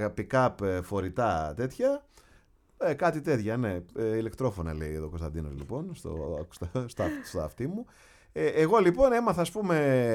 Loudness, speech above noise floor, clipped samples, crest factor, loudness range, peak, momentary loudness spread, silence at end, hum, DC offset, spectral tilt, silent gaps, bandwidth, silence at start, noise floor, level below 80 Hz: -29 LUFS; 32 dB; under 0.1%; 18 dB; 8 LU; -10 dBFS; 13 LU; 0 s; none; under 0.1%; -7 dB/octave; none; 16 kHz; 0 s; -61 dBFS; -48 dBFS